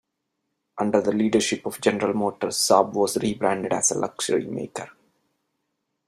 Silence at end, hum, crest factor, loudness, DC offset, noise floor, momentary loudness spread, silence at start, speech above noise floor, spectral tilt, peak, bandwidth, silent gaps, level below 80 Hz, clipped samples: 1.15 s; none; 22 dB; -23 LUFS; under 0.1%; -78 dBFS; 13 LU; 0.75 s; 55 dB; -3.5 dB/octave; -2 dBFS; 14.5 kHz; none; -64 dBFS; under 0.1%